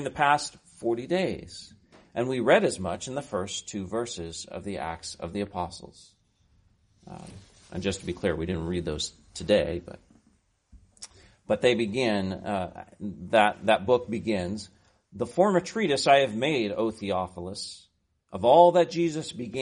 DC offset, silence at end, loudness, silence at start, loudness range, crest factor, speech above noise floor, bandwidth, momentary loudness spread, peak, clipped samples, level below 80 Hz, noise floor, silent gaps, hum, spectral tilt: under 0.1%; 0 s; -27 LUFS; 0 s; 10 LU; 22 dB; 40 dB; 10.5 kHz; 18 LU; -4 dBFS; under 0.1%; -54 dBFS; -67 dBFS; none; none; -5 dB/octave